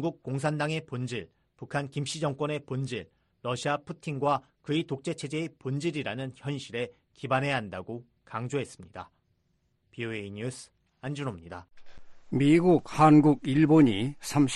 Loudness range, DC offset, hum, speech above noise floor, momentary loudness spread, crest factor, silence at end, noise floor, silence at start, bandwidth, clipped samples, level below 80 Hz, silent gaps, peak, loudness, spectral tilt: 14 LU; under 0.1%; none; 45 dB; 19 LU; 20 dB; 0 s; -73 dBFS; 0 s; 11.5 kHz; under 0.1%; -62 dBFS; none; -8 dBFS; -28 LUFS; -6.5 dB/octave